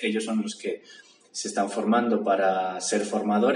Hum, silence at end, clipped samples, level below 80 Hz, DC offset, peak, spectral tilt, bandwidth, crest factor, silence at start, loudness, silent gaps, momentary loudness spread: none; 0 s; under 0.1%; -86 dBFS; under 0.1%; -10 dBFS; -4 dB/octave; 11 kHz; 16 dB; 0 s; -26 LUFS; none; 11 LU